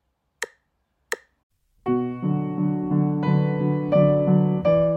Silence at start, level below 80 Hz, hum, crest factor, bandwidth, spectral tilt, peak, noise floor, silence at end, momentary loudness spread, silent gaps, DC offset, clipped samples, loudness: 0.4 s; -54 dBFS; none; 16 dB; 16 kHz; -8.5 dB/octave; -6 dBFS; -72 dBFS; 0 s; 15 LU; 1.43-1.50 s; under 0.1%; under 0.1%; -22 LUFS